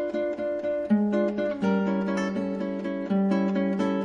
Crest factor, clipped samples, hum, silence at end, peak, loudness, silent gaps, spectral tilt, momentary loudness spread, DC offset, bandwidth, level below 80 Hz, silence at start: 12 dB; under 0.1%; none; 0 s; -12 dBFS; -26 LUFS; none; -8 dB/octave; 6 LU; under 0.1%; 7.4 kHz; -62 dBFS; 0 s